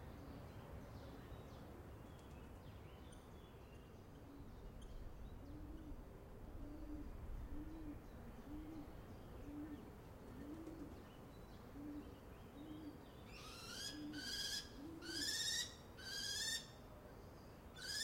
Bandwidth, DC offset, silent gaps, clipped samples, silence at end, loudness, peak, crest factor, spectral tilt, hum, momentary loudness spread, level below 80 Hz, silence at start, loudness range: 16.5 kHz; under 0.1%; none; under 0.1%; 0 s; -51 LUFS; -30 dBFS; 22 dB; -2.5 dB/octave; none; 15 LU; -60 dBFS; 0 s; 14 LU